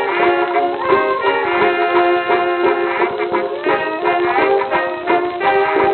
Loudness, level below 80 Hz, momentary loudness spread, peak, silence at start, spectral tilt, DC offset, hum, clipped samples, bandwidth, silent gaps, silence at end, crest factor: -16 LUFS; -56 dBFS; 4 LU; -2 dBFS; 0 s; -8.5 dB/octave; under 0.1%; none; under 0.1%; 4.5 kHz; none; 0 s; 14 dB